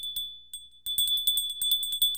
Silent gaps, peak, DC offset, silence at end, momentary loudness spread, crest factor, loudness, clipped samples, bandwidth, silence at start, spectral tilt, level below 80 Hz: none; -12 dBFS; 0.2%; 0 s; 15 LU; 18 dB; -25 LUFS; under 0.1%; 18.5 kHz; 0 s; 3 dB/octave; -60 dBFS